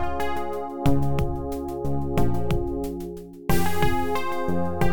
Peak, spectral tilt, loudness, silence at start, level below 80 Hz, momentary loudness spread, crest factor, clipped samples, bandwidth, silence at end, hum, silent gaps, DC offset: -8 dBFS; -6.5 dB/octave; -27 LUFS; 0 s; -34 dBFS; 7 LU; 14 dB; under 0.1%; 19 kHz; 0 s; none; none; 4%